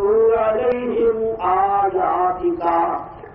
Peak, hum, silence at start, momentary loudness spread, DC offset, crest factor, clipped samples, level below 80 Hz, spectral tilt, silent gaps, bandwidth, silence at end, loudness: -6 dBFS; none; 0 s; 5 LU; under 0.1%; 12 dB; under 0.1%; -46 dBFS; -5 dB/octave; none; 3.8 kHz; 0 s; -19 LUFS